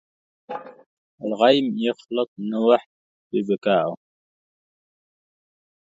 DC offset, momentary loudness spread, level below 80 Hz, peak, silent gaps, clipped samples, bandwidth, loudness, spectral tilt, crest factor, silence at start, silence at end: under 0.1%; 18 LU; -74 dBFS; -4 dBFS; 0.86-1.18 s, 2.28-2.36 s, 2.86-3.31 s; under 0.1%; 7.8 kHz; -22 LUFS; -6.5 dB/octave; 22 dB; 0.5 s; 1.9 s